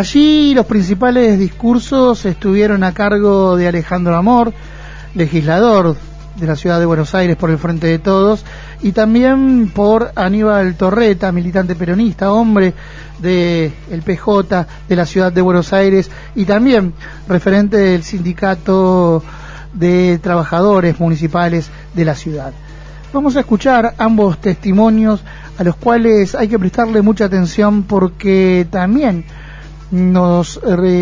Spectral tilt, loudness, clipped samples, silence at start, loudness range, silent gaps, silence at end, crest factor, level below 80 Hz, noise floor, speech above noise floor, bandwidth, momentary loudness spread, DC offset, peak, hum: -7.5 dB/octave; -13 LUFS; under 0.1%; 0 s; 2 LU; none; 0 s; 12 dB; -32 dBFS; -31 dBFS; 19 dB; 7.6 kHz; 10 LU; under 0.1%; 0 dBFS; none